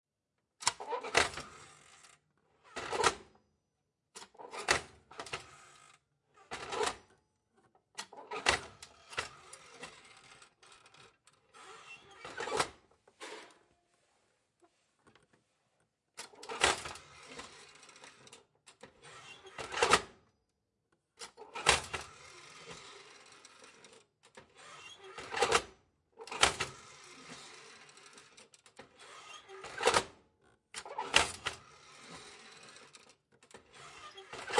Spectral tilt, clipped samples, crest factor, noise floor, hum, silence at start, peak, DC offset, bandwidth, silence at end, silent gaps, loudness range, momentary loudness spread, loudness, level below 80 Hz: -1 dB/octave; under 0.1%; 34 dB; -86 dBFS; none; 0.6 s; -6 dBFS; under 0.1%; 11.5 kHz; 0 s; none; 13 LU; 26 LU; -34 LUFS; -64 dBFS